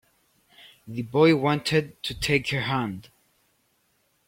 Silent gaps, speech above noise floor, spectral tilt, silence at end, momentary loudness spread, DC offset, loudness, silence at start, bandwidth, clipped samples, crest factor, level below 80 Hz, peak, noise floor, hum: none; 45 dB; -5.5 dB/octave; 1.25 s; 15 LU; under 0.1%; -24 LUFS; 0.85 s; 16.5 kHz; under 0.1%; 20 dB; -52 dBFS; -8 dBFS; -69 dBFS; none